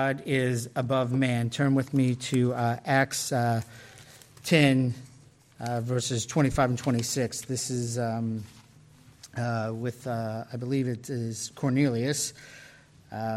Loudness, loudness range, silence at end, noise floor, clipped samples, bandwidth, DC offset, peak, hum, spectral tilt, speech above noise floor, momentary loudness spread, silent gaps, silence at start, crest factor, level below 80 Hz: -28 LUFS; 6 LU; 0 s; -55 dBFS; under 0.1%; 15 kHz; under 0.1%; -10 dBFS; none; -5.5 dB/octave; 28 dB; 12 LU; none; 0 s; 18 dB; -58 dBFS